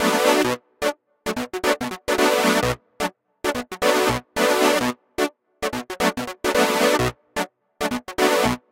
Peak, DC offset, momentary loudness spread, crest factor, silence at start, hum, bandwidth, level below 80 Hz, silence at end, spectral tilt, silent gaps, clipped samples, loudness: -2 dBFS; under 0.1%; 11 LU; 20 dB; 0 s; none; 17 kHz; -46 dBFS; 0.15 s; -3.5 dB/octave; none; under 0.1%; -22 LUFS